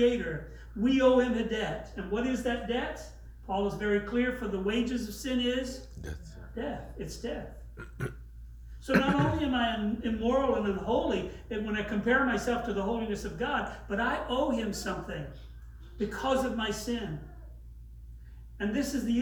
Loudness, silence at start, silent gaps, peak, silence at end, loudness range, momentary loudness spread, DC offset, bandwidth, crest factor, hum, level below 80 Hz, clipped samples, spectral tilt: -31 LUFS; 0 s; none; -10 dBFS; 0 s; 6 LU; 22 LU; under 0.1%; over 20 kHz; 20 dB; none; -46 dBFS; under 0.1%; -5.5 dB/octave